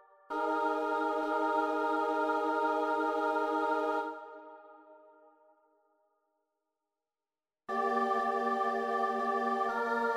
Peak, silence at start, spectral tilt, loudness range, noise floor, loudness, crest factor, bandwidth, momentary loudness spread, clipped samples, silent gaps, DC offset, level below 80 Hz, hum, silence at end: -18 dBFS; 0.3 s; -4.5 dB/octave; 10 LU; under -90 dBFS; -32 LUFS; 16 dB; 15.5 kHz; 8 LU; under 0.1%; none; under 0.1%; -78 dBFS; none; 0 s